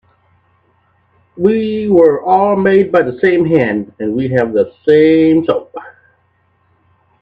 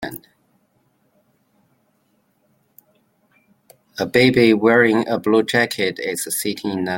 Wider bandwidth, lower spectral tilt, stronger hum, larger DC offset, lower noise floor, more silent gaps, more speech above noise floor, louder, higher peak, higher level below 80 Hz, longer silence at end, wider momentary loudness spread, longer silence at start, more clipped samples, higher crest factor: second, 5 kHz vs 17 kHz; first, -9 dB/octave vs -4.5 dB/octave; neither; neither; second, -57 dBFS vs -64 dBFS; neither; about the same, 46 dB vs 47 dB; first, -12 LUFS vs -17 LUFS; about the same, 0 dBFS vs -2 dBFS; first, -54 dBFS vs -60 dBFS; first, 1.35 s vs 0 s; second, 9 LU vs 14 LU; first, 1.35 s vs 0 s; neither; second, 14 dB vs 20 dB